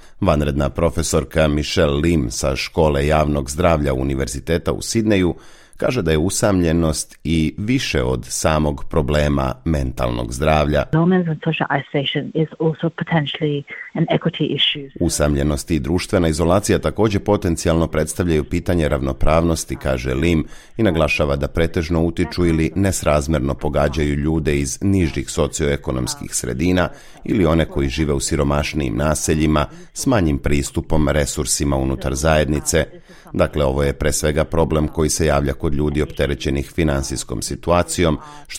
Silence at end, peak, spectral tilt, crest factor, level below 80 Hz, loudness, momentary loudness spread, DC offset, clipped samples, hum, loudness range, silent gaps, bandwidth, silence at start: 0 s; -2 dBFS; -5 dB/octave; 16 dB; -30 dBFS; -19 LUFS; 5 LU; under 0.1%; under 0.1%; none; 2 LU; none; 16.5 kHz; 0.05 s